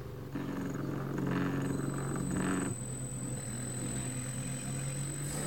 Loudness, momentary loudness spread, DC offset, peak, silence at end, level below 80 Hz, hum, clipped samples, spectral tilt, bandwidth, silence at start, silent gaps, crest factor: -36 LUFS; 5 LU; 0.2%; -22 dBFS; 0 s; -54 dBFS; none; under 0.1%; -5 dB/octave; 17 kHz; 0 s; none; 16 dB